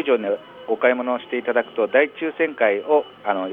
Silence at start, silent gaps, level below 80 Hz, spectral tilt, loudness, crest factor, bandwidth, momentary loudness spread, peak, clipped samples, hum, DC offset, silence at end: 0 s; none; -74 dBFS; -7 dB/octave; -21 LUFS; 18 dB; 3.9 kHz; 7 LU; -4 dBFS; under 0.1%; none; under 0.1%; 0 s